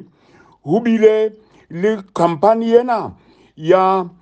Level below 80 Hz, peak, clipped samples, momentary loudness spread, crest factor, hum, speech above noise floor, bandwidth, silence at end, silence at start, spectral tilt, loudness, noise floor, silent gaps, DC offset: -60 dBFS; 0 dBFS; under 0.1%; 13 LU; 16 dB; none; 35 dB; 8.6 kHz; 0.15 s; 0.65 s; -7.5 dB/octave; -15 LUFS; -50 dBFS; none; under 0.1%